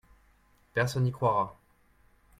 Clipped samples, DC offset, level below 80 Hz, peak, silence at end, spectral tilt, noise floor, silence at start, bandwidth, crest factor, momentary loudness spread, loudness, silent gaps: under 0.1%; under 0.1%; -60 dBFS; -14 dBFS; 0.9 s; -6.5 dB/octave; -64 dBFS; 0.75 s; 14.5 kHz; 18 dB; 7 LU; -30 LUFS; none